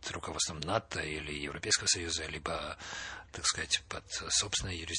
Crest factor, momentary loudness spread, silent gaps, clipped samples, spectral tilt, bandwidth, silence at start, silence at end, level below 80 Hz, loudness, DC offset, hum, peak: 22 dB; 10 LU; none; under 0.1%; -1.5 dB/octave; 11 kHz; 0 s; 0 s; -54 dBFS; -33 LUFS; under 0.1%; none; -14 dBFS